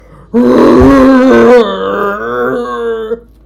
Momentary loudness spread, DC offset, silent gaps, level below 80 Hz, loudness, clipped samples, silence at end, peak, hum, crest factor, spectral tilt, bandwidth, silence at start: 12 LU; under 0.1%; none; -28 dBFS; -8 LUFS; 8%; 0.25 s; 0 dBFS; none; 8 dB; -7 dB/octave; 13 kHz; 0.35 s